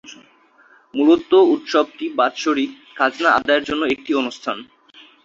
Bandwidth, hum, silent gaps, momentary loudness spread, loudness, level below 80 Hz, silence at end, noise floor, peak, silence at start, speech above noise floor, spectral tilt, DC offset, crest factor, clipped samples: 7.6 kHz; none; none; 13 LU; -18 LUFS; -58 dBFS; 0.6 s; -53 dBFS; -2 dBFS; 0.1 s; 35 dB; -3.5 dB/octave; under 0.1%; 16 dB; under 0.1%